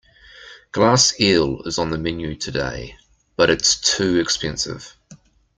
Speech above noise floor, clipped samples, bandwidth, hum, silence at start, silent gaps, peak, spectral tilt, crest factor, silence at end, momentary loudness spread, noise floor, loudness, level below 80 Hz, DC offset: 29 dB; under 0.1%; 11 kHz; none; 0.35 s; none; -2 dBFS; -3 dB/octave; 20 dB; 0.45 s; 15 LU; -48 dBFS; -19 LUFS; -44 dBFS; under 0.1%